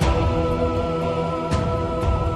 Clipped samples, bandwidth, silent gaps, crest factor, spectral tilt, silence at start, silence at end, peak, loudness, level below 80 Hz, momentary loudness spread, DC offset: under 0.1%; 11.5 kHz; none; 14 dB; -7 dB/octave; 0 s; 0 s; -8 dBFS; -23 LUFS; -28 dBFS; 3 LU; under 0.1%